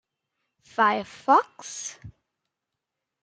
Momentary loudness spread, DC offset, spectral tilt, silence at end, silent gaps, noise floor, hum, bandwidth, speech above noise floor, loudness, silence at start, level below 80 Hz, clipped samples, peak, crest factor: 15 LU; under 0.1%; -3 dB/octave; 1.15 s; none; -85 dBFS; none; 9.4 kHz; 61 dB; -23 LUFS; 0.8 s; -68 dBFS; under 0.1%; -6 dBFS; 24 dB